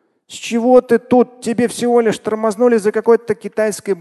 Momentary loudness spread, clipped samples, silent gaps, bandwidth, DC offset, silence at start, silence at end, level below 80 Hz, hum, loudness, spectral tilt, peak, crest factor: 8 LU; under 0.1%; none; 12.5 kHz; under 0.1%; 0.3 s; 0 s; -58 dBFS; none; -15 LUFS; -5 dB/octave; 0 dBFS; 14 dB